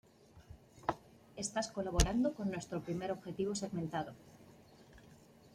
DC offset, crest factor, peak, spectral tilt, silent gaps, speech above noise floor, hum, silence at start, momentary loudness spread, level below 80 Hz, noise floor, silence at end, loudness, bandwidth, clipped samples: under 0.1%; 26 dB; -14 dBFS; -5 dB/octave; none; 24 dB; none; 0.35 s; 25 LU; -48 dBFS; -61 dBFS; 0.05 s; -38 LUFS; 15.5 kHz; under 0.1%